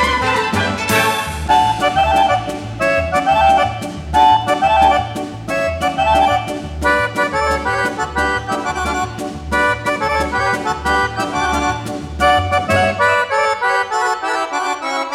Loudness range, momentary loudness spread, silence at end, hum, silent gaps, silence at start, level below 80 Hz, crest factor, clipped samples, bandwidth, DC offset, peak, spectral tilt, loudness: 3 LU; 7 LU; 0 s; none; none; 0 s; -34 dBFS; 14 dB; under 0.1%; 16.5 kHz; under 0.1%; -2 dBFS; -4 dB/octave; -16 LUFS